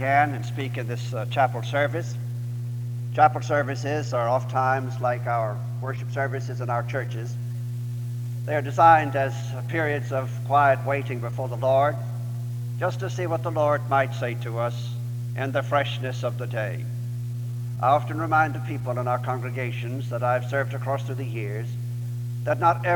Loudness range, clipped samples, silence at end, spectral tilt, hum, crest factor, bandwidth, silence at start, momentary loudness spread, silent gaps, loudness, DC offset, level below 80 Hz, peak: 6 LU; under 0.1%; 0 s; -7 dB/octave; 60 Hz at -30 dBFS; 22 dB; 19 kHz; 0 s; 11 LU; none; -25 LUFS; under 0.1%; -58 dBFS; -4 dBFS